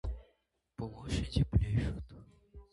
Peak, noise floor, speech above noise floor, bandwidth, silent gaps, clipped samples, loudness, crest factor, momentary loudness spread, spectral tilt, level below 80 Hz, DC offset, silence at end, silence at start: -16 dBFS; -76 dBFS; 44 dB; 11.5 kHz; none; under 0.1%; -35 LUFS; 20 dB; 19 LU; -7 dB/octave; -42 dBFS; under 0.1%; 0.1 s; 0.05 s